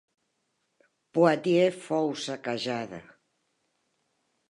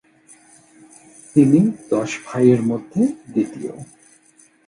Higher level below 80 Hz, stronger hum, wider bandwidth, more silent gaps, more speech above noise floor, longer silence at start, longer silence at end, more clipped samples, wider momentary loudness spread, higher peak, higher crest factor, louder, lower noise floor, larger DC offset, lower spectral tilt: second, -76 dBFS vs -60 dBFS; neither; about the same, 11 kHz vs 11.5 kHz; neither; first, 50 dB vs 36 dB; second, 1.15 s vs 1.35 s; first, 1.5 s vs 0.85 s; neither; about the same, 11 LU vs 13 LU; second, -8 dBFS vs -2 dBFS; about the same, 22 dB vs 18 dB; second, -27 LUFS vs -18 LUFS; first, -77 dBFS vs -54 dBFS; neither; second, -5.5 dB/octave vs -7.5 dB/octave